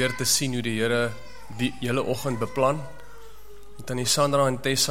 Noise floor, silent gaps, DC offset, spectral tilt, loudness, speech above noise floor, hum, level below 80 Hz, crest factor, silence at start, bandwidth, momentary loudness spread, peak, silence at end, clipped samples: -48 dBFS; none; 1%; -3.5 dB/octave; -25 LUFS; 23 dB; none; -52 dBFS; 18 dB; 0 s; 16.5 kHz; 13 LU; -8 dBFS; 0 s; under 0.1%